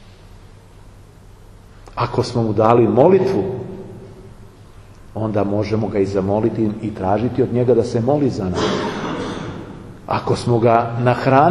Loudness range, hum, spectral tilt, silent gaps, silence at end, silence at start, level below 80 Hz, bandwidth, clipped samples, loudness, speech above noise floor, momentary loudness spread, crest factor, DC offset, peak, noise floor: 4 LU; none; -7.5 dB/octave; none; 0 s; 0 s; -44 dBFS; 11.5 kHz; under 0.1%; -18 LUFS; 26 dB; 18 LU; 18 dB; under 0.1%; 0 dBFS; -42 dBFS